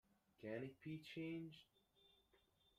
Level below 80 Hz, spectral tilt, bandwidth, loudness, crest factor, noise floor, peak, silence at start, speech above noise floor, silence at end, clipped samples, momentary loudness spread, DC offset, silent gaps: -86 dBFS; -7 dB/octave; 14.5 kHz; -53 LUFS; 18 dB; -79 dBFS; -36 dBFS; 0.4 s; 27 dB; 0.4 s; under 0.1%; 8 LU; under 0.1%; none